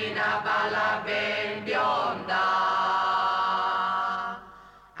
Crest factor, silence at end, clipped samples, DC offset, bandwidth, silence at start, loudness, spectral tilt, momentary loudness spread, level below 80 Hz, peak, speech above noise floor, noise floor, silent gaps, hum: 10 dB; 0 s; under 0.1%; under 0.1%; 11.5 kHz; 0 s; -26 LUFS; -3.5 dB/octave; 5 LU; -66 dBFS; -16 dBFS; 24 dB; -50 dBFS; none; none